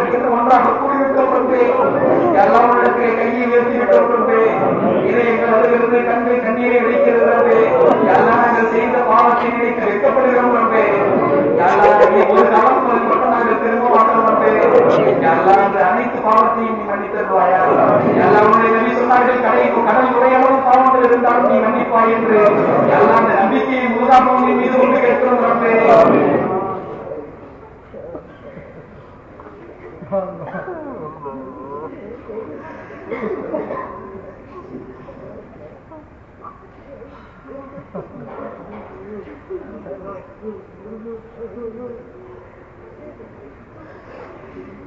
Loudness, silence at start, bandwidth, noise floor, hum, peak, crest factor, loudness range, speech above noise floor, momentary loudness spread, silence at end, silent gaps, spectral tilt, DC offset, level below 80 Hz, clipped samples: -13 LUFS; 0 s; 7.2 kHz; -40 dBFS; none; 0 dBFS; 14 dB; 20 LU; 26 dB; 22 LU; 0 s; none; -7.5 dB/octave; under 0.1%; -50 dBFS; under 0.1%